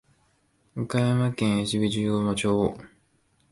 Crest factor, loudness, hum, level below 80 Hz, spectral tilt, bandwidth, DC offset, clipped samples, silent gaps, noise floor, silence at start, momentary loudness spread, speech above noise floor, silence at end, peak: 16 dB; -25 LUFS; none; -54 dBFS; -6 dB/octave; 11.5 kHz; under 0.1%; under 0.1%; none; -67 dBFS; 0.75 s; 9 LU; 42 dB; 0.65 s; -10 dBFS